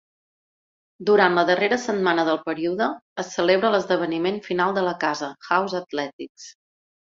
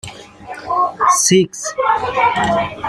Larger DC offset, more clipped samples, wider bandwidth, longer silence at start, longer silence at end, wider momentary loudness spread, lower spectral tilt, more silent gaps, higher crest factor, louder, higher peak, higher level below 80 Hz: neither; neither; second, 7.6 kHz vs 14 kHz; first, 1 s vs 0.05 s; first, 0.6 s vs 0 s; second, 12 LU vs 16 LU; first, -4.5 dB/octave vs -3 dB/octave; first, 3.02-3.16 s, 6.13-6.19 s, 6.29-6.35 s vs none; about the same, 20 dB vs 16 dB; second, -22 LUFS vs -15 LUFS; about the same, -4 dBFS vs -2 dBFS; second, -68 dBFS vs -48 dBFS